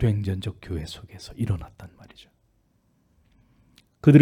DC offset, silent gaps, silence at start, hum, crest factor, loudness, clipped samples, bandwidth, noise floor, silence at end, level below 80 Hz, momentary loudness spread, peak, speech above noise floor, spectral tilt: under 0.1%; none; 0 s; none; 22 dB; -26 LUFS; under 0.1%; 11.5 kHz; -66 dBFS; 0 s; -46 dBFS; 24 LU; -2 dBFS; 37 dB; -8.5 dB/octave